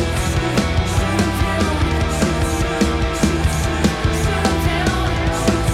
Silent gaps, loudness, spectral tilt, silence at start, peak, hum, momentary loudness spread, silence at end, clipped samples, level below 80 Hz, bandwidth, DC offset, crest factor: none; -18 LUFS; -5 dB/octave; 0 s; -2 dBFS; none; 1 LU; 0 s; under 0.1%; -24 dBFS; 16 kHz; under 0.1%; 16 dB